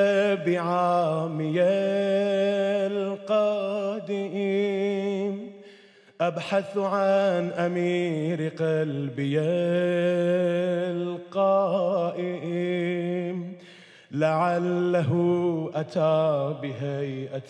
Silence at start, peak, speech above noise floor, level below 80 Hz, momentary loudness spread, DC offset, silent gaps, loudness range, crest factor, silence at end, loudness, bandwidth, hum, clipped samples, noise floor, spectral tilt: 0 s; -10 dBFS; 29 dB; -84 dBFS; 8 LU; under 0.1%; none; 3 LU; 14 dB; 0 s; -25 LUFS; 10.5 kHz; none; under 0.1%; -53 dBFS; -7.5 dB/octave